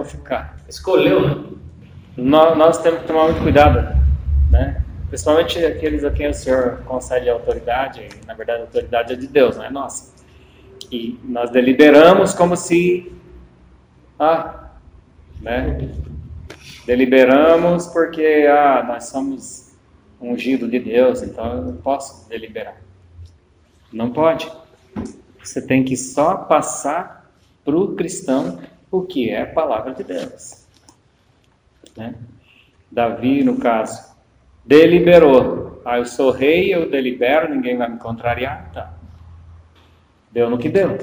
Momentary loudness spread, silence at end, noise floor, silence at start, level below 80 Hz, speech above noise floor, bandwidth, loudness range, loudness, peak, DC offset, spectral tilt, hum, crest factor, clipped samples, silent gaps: 21 LU; 0 s; -57 dBFS; 0 s; -30 dBFS; 41 dB; over 20 kHz; 10 LU; -16 LUFS; 0 dBFS; under 0.1%; -6 dB/octave; none; 18 dB; under 0.1%; none